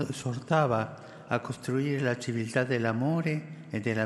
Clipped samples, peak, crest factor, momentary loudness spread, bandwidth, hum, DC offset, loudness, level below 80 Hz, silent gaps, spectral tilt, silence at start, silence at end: under 0.1%; -10 dBFS; 20 dB; 8 LU; 12.5 kHz; none; under 0.1%; -30 LUFS; -70 dBFS; none; -6.5 dB/octave; 0 s; 0 s